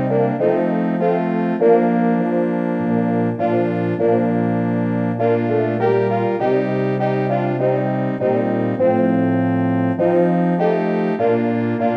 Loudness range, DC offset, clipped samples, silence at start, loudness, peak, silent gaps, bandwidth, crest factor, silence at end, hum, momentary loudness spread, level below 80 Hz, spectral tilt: 1 LU; under 0.1%; under 0.1%; 0 s; -18 LUFS; -2 dBFS; none; 5.4 kHz; 14 dB; 0 s; none; 3 LU; -62 dBFS; -10 dB/octave